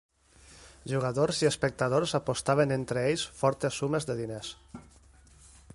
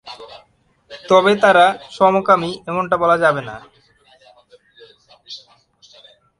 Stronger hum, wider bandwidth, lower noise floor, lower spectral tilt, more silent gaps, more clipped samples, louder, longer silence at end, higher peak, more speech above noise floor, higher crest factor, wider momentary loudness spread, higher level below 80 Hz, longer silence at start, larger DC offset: neither; about the same, 11.5 kHz vs 11.5 kHz; about the same, -57 dBFS vs -57 dBFS; about the same, -5 dB/octave vs -5 dB/octave; neither; neither; second, -29 LUFS vs -15 LUFS; about the same, 0.95 s vs 1 s; second, -12 dBFS vs 0 dBFS; second, 28 dB vs 42 dB; about the same, 20 dB vs 18 dB; second, 15 LU vs 24 LU; about the same, -58 dBFS vs -58 dBFS; first, 0.5 s vs 0.05 s; neither